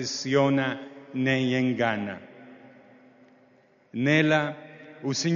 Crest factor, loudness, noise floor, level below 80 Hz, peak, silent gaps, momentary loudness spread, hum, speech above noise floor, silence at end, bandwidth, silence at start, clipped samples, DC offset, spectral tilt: 18 dB; -25 LUFS; -60 dBFS; -70 dBFS; -8 dBFS; none; 16 LU; none; 35 dB; 0 s; 7.2 kHz; 0 s; under 0.1%; under 0.1%; -4.5 dB/octave